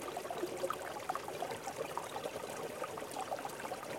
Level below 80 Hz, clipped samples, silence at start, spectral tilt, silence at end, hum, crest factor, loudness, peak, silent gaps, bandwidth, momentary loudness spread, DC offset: -74 dBFS; under 0.1%; 0 s; -3 dB/octave; 0 s; none; 18 dB; -42 LUFS; -24 dBFS; none; 17 kHz; 3 LU; under 0.1%